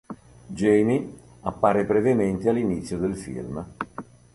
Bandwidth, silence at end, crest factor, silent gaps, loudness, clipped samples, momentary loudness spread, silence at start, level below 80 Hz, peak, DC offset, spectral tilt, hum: 11.5 kHz; 0.3 s; 18 dB; none; -24 LUFS; under 0.1%; 19 LU; 0.1 s; -50 dBFS; -6 dBFS; under 0.1%; -7.5 dB/octave; none